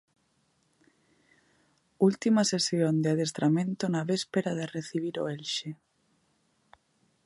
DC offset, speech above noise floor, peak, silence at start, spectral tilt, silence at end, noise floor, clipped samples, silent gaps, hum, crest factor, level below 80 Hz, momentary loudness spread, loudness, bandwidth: under 0.1%; 44 dB; -10 dBFS; 2 s; -5 dB/octave; 1.5 s; -72 dBFS; under 0.1%; none; none; 20 dB; -76 dBFS; 9 LU; -28 LUFS; 11.5 kHz